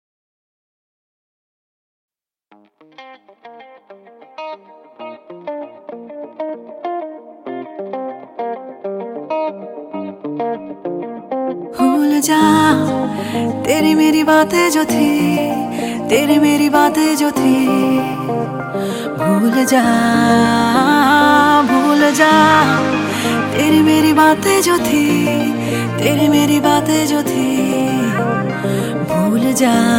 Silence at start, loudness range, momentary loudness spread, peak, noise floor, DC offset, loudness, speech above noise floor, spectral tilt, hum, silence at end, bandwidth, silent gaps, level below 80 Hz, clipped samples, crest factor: 3 s; 17 LU; 17 LU; 0 dBFS; -42 dBFS; under 0.1%; -14 LUFS; 29 dB; -4.5 dB/octave; none; 0 s; 17 kHz; none; -52 dBFS; under 0.1%; 16 dB